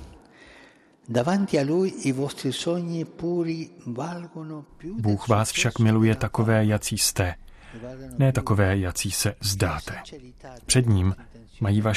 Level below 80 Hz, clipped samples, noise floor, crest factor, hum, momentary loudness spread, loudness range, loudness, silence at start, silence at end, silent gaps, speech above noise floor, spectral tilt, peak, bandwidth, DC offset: -48 dBFS; under 0.1%; -54 dBFS; 18 dB; none; 17 LU; 5 LU; -24 LUFS; 0 s; 0 s; none; 29 dB; -5 dB/octave; -6 dBFS; 14 kHz; under 0.1%